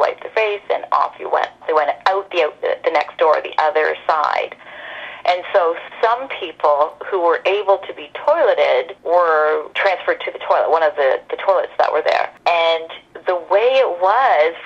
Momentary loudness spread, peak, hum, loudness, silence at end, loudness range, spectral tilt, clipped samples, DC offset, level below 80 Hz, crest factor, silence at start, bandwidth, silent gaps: 8 LU; -2 dBFS; none; -17 LUFS; 0 s; 2 LU; -3 dB/octave; under 0.1%; under 0.1%; -66 dBFS; 16 dB; 0 s; 7.8 kHz; none